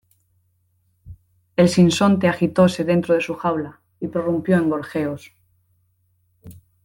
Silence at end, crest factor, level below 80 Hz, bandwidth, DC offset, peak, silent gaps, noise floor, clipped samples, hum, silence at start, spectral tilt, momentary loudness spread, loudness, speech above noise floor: 0.3 s; 18 dB; -56 dBFS; 12.5 kHz; under 0.1%; -4 dBFS; none; -65 dBFS; under 0.1%; none; 1.05 s; -6.5 dB/octave; 12 LU; -19 LUFS; 47 dB